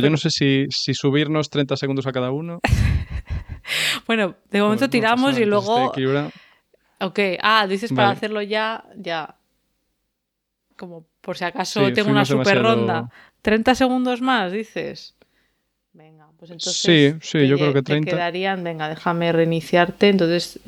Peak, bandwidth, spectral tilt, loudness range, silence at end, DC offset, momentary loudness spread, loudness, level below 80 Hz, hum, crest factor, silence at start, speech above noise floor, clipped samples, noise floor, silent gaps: -2 dBFS; 15.5 kHz; -5 dB/octave; 5 LU; 0.15 s; under 0.1%; 13 LU; -20 LUFS; -38 dBFS; none; 20 dB; 0 s; 58 dB; under 0.1%; -78 dBFS; none